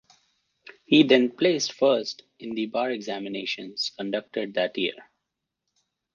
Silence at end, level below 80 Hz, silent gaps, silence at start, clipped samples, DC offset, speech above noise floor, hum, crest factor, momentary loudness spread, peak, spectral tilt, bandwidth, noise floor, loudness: 1.1 s; -76 dBFS; none; 0.9 s; under 0.1%; under 0.1%; 58 dB; none; 22 dB; 12 LU; -6 dBFS; -4 dB/octave; 7.2 kHz; -83 dBFS; -25 LUFS